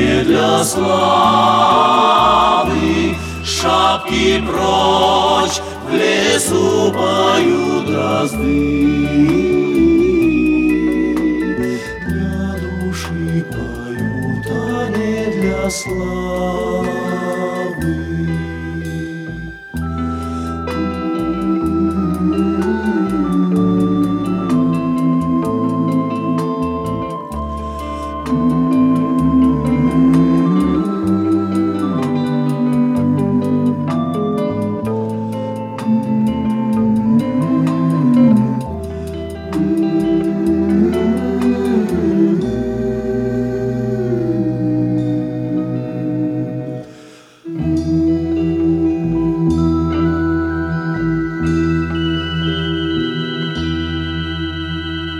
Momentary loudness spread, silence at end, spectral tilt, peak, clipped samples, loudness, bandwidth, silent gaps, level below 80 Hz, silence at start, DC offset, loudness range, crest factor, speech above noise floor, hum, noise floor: 10 LU; 0 s; -6 dB/octave; -2 dBFS; under 0.1%; -16 LUFS; 15 kHz; none; -36 dBFS; 0 s; under 0.1%; 6 LU; 14 dB; 27 dB; none; -40 dBFS